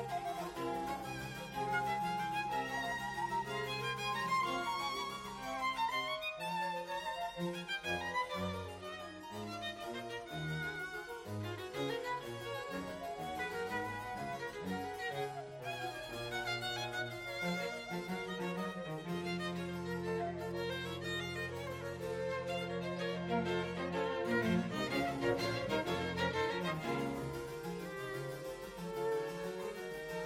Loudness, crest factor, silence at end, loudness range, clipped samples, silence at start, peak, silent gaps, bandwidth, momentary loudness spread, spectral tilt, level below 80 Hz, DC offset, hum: -39 LUFS; 18 dB; 0 s; 5 LU; under 0.1%; 0 s; -22 dBFS; none; 16 kHz; 8 LU; -5 dB/octave; -64 dBFS; under 0.1%; none